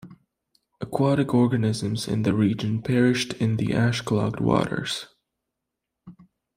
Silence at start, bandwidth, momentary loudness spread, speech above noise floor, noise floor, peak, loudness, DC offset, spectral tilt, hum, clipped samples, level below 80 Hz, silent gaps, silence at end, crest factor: 0.05 s; 15.5 kHz; 8 LU; 61 dB; -84 dBFS; -6 dBFS; -24 LUFS; under 0.1%; -6.5 dB/octave; none; under 0.1%; -54 dBFS; none; 0.45 s; 18 dB